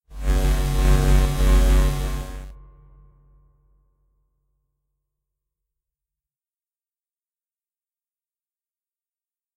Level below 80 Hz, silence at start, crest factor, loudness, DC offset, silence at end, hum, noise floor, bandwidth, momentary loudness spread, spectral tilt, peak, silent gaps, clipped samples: -24 dBFS; 0.1 s; 18 dB; -21 LUFS; under 0.1%; 7 s; none; under -90 dBFS; 16 kHz; 16 LU; -5.5 dB/octave; -6 dBFS; none; under 0.1%